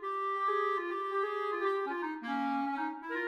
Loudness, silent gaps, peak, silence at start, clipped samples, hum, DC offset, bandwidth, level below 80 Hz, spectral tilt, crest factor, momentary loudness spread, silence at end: -34 LUFS; none; -20 dBFS; 0 s; under 0.1%; none; under 0.1%; 10.5 kHz; -82 dBFS; -4.5 dB/octave; 14 dB; 5 LU; 0 s